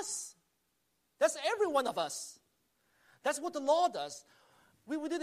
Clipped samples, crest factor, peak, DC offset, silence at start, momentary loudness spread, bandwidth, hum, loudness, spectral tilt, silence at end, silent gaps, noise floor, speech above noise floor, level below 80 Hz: under 0.1%; 20 dB; -16 dBFS; under 0.1%; 0 s; 13 LU; 15 kHz; none; -34 LUFS; -1.5 dB/octave; 0 s; none; -79 dBFS; 45 dB; -86 dBFS